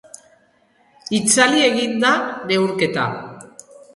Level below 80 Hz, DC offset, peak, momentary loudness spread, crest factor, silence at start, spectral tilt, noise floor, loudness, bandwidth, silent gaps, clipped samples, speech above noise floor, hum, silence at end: -62 dBFS; under 0.1%; -2 dBFS; 15 LU; 20 dB; 1.1 s; -3 dB/octave; -58 dBFS; -17 LUFS; 11.5 kHz; none; under 0.1%; 41 dB; none; 0.5 s